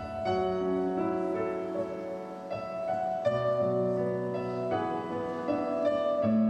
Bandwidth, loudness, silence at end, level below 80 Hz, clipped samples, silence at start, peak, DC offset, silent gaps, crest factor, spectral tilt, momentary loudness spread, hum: 9 kHz; -31 LUFS; 0 s; -60 dBFS; under 0.1%; 0 s; -16 dBFS; under 0.1%; none; 14 dB; -8 dB/octave; 8 LU; none